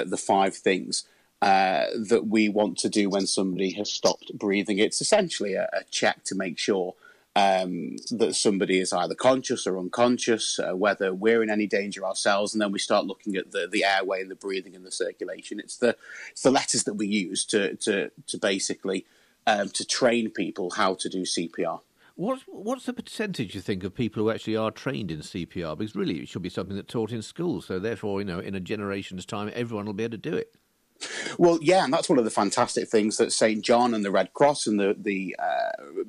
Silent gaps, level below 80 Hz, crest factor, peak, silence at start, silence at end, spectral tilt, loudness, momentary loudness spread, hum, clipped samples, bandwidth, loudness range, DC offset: none; -66 dBFS; 16 dB; -10 dBFS; 0 s; 0 s; -3.5 dB/octave; -26 LUFS; 11 LU; none; under 0.1%; 13 kHz; 7 LU; under 0.1%